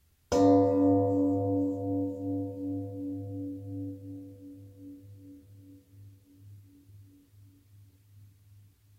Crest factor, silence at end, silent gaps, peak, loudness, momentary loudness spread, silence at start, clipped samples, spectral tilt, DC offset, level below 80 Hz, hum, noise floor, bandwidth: 20 dB; 0.75 s; none; -12 dBFS; -29 LUFS; 26 LU; 0.3 s; under 0.1%; -8.5 dB/octave; under 0.1%; -62 dBFS; none; -58 dBFS; 8 kHz